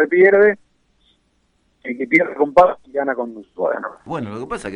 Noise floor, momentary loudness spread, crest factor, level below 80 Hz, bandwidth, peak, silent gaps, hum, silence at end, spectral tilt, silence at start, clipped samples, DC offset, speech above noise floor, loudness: -63 dBFS; 17 LU; 18 dB; -52 dBFS; 10.5 kHz; -2 dBFS; none; none; 0 s; -6.5 dB/octave; 0 s; under 0.1%; under 0.1%; 46 dB; -17 LUFS